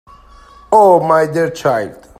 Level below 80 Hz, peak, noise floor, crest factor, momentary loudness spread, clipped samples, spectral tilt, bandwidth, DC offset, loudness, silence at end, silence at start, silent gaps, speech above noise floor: -48 dBFS; 0 dBFS; -41 dBFS; 14 dB; 8 LU; under 0.1%; -6 dB/octave; 15.5 kHz; under 0.1%; -12 LUFS; 0.25 s; 0.7 s; none; 29 dB